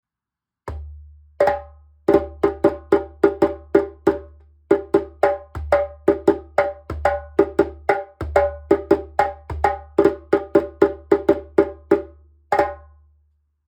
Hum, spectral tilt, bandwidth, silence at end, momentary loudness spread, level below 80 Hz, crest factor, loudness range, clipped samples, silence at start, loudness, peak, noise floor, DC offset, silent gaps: none; -7.5 dB/octave; 9.4 kHz; 0.95 s; 7 LU; -40 dBFS; 20 dB; 1 LU; under 0.1%; 0.65 s; -21 LUFS; -2 dBFS; -87 dBFS; under 0.1%; none